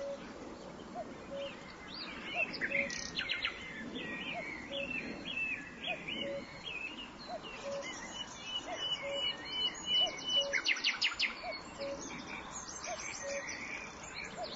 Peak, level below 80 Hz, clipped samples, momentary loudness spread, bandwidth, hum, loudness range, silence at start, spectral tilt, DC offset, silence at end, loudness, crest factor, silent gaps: -18 dBFS; -64 dBFS; under 0.1%; 14 LU; 7.6 kHz; none; 7 LU; 0 s; 0 dB/octave; under 0.1%; 0 s; -37 LUFS; 20 dB; none